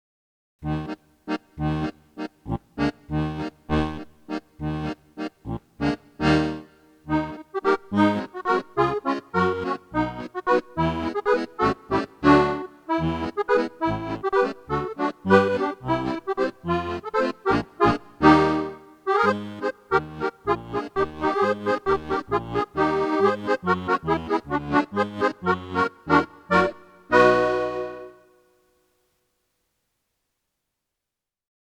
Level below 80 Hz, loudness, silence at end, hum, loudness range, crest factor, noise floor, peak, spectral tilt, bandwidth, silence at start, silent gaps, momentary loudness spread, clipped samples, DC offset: -46 dBFS; -24 LUFS; 3.55 s; none; 7 LU; 22 dB; -87 dBFS; -2 dBFS; -7 dB/octave; 10 kHz; 0.6 s; none; 13 LU; under 0.1%; under 0.1%